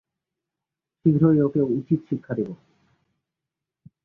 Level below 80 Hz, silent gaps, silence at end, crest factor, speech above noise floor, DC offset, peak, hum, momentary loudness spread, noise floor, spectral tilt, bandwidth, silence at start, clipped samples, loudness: -60 dBFS; none; 1.5 s; 18 dB; 66 dB; under 0.1%; -6 dBFS; none; 12 LU; -87 dBFS; -12.5 dB/octave; 2.9 kHz; 1.05 s; under 0.1%; -23 LUFS